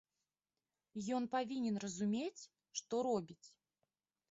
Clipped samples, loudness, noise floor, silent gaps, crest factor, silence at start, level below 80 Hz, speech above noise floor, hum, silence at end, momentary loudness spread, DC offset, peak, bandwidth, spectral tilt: under 0.1%; -41 LUFS; under -90 dBFS; none; 16 dB; 0.95 s; -82 dBFS; over 50 dB; none; 0.8 s; 15 LU; under 0.1%; -26 dBFS; 8 kHz; -5 dB/octave